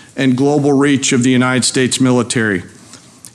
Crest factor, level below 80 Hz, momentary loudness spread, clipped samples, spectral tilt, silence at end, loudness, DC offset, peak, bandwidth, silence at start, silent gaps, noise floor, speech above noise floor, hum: 10 dB; -56 dBFS; 4 LU; under 0.1%; -4.5 dB/octave; 0.4 s; -13 LUFS; under 0.1%; -4 dBFS; 12.5 kHz; 0.15 s; none; -40 dBFS; 27 dB; none